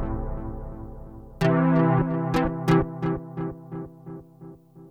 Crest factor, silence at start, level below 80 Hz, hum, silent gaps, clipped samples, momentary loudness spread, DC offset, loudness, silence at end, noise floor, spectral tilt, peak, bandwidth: 20 dB; 0 s; -40 dBFS; none; none; under 0.1%; 22 LU; under 0.1%; -24 LUFS; 0 s; -46 dBFS; -8.5 dB/octave; -6 dBFS; 8.8 kHz